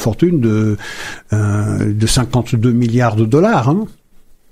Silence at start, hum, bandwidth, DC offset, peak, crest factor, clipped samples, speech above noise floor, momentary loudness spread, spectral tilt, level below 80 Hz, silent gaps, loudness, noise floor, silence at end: 0 s; none; 15 kHz; under 0.1%; 0 dBFS; 14 dB; under 0.1%; 30 dB; 9 LU; -6.5 dB/octave; -34 dBFS; none; -15 LUFS; -43 dBFS; 0.3 s